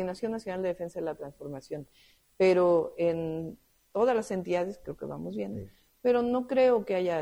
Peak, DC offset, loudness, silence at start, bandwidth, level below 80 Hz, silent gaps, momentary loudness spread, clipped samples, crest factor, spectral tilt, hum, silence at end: -12 dBFS; under 0.1%; -29 LUFS; 0 s; 12.5 kHz; -62 dBFS; none; 16 LU; under 0.1%; 16 dB; -7 dB/octave; none; 0 s